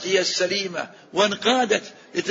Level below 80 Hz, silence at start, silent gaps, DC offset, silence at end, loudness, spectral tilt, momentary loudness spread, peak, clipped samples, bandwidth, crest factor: -70 dBFS; 0 s; none; under 0.1%; 0 s; -22 LUFS; -2.5 dB/octave; 10 LU; -4 dBFS; under 0.1%; 8 kHz; 18 dB